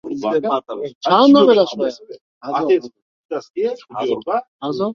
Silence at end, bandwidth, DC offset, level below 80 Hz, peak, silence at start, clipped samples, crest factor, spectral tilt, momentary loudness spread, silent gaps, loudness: 0 s; 7 kHz; under 0.1%; -64 dBFS; -2 dBFS; 0.05 s; under 0.1%; 16 dB; -6 dB/octave; 17 LU; 0.95-1.01 s, 2.21-2.41 s, 3.02-3.29 s, 3.50-3.54 s, 4.48-4.59 s; -17 LUFS